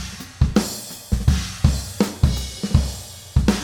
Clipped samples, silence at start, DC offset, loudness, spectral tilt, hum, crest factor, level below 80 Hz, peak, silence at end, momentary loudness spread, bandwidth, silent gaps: under 0.1%; 0 s; under 0.1%; -22 LUFS; -5.5 dB/octave; none; 20 dB; -26 dBFS; -2 dBFS; 0 s; 9 LU; 18 kHz; none